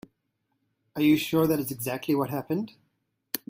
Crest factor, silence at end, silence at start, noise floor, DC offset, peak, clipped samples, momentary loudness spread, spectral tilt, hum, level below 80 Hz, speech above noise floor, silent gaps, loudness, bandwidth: 22 dB; 0.15 s; 0.95 s; -77 dBFS; under 0.1%; -6 dBFS; under 0.1%; 12 LU; -5.5 dB/octave; none; -64 dBFS; 52 dB; none; -27 LUFS; 16 kHz